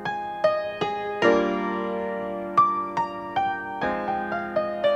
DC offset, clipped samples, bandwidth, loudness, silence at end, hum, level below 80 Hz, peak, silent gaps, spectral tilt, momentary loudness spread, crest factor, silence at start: under 0.1%; under 0.1%; 8.6 kHz; -25 LUFS; 0 s; none; -58 dBFS; -6 dBFS; none; -6 dB/octave; 8 LU; 18 dB; 0 s